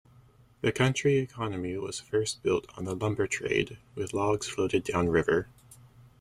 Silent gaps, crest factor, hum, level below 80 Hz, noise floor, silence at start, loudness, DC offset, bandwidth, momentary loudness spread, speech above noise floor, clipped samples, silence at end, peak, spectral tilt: none; 20 dB; none; -56 dBFS; -58 dBFS; 0.65 s; -29 LUFS; under 0.1%; 14.5 kHz; 8 LU; 30 dB; under 0.1%; 0.35 s; -10 dBFS; -5 dB/octave